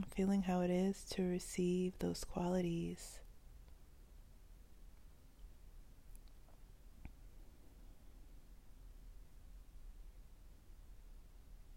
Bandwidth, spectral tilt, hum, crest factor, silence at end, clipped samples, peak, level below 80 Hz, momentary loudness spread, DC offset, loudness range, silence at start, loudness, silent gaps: 16 kHz; -6.5 dB/octave; none; 18 dB; 0 s; under 0.1%; -26 dBFS; -58 dBFS; 27 LU; under 0.1%; 24 LU; 0 s; -40 LUFS; none